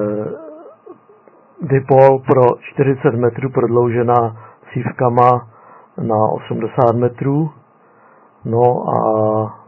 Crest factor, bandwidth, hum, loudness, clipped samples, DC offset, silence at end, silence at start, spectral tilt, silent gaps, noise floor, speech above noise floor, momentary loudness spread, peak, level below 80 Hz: 16 dB; 4.4 kHz; none; -15 LUFS; under 0.1%; under 0.1%; 0.1 s; 0 s; -11 dB/octave; none; -49 dBFS; 35 dB; 13 LU; 0 dBFS; -56 dBFS